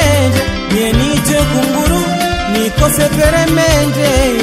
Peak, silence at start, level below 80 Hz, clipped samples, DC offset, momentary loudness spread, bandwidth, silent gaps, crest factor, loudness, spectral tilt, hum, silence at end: 0 dBFS; 0 s; -22 dBFS; under 0.1%; under 0.1%; 4 LU; 16.5 kHz; none; 12 dB; -12 LUFS; -4.5 dB/octave; none; 0 s